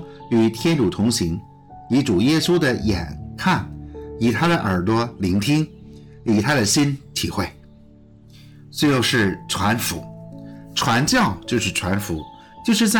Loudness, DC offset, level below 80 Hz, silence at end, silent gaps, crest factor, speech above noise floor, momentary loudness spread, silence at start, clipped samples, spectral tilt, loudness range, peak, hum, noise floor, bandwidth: -20 LUFS; under 0.1%; -46 dBFS; 0 s; none; 14 dB; 28 dB; 14 LU; 0 s; under 0.1%; -4.5 dB/octave; 2 LU; -8 dBFS; none; -47 dBFS; 19 kHz